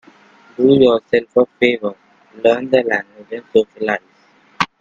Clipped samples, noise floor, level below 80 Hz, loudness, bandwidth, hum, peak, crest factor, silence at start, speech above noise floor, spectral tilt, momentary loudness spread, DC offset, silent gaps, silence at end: under 0.1%; -52 dBFS; -56 dBFS; -16 LUFS; 7.6 kHz; none; 0 dBFS; 16 dB; 0.6 s; 37 dB; -6 dB/octave; 13 LU; under 0.1%; none; 0.15 s